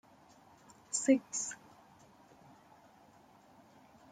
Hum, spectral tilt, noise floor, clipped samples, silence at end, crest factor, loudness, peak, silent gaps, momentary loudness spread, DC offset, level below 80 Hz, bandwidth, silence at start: none; -3 dB/octave; -62 dBFS; under 0.1%; 2.55 s; 24 dB; -33 LUFS; -16 dBFS; none; 13 LU; under 0.1%; -82 dBFS; 9.6 kHz; 0.9 s